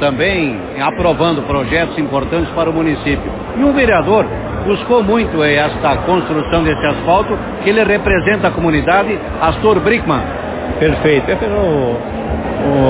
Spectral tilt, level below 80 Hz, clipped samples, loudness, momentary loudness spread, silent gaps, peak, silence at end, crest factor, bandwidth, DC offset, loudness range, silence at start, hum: -10.5 dB/octave; -28 dBFS; under 0.1%; -14 LUFS; 7 LU; none; 0 dBFS; 0 s; 14 dB; 4 kHz; under 0.1%; 2 LU; 0 s; none